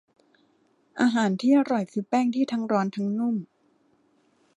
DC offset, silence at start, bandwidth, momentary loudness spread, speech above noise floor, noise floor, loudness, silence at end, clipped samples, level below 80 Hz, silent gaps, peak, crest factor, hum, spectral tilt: under 0.1%; 0.95 s; 10.5 kHz; 7 LU; 42 dB; -65 dBFS; -25 LUFS; 1.1 s; under 0.1%; -76 dBFS; none; -10 dBFS; 16 dB; none; -6.5 dB/octave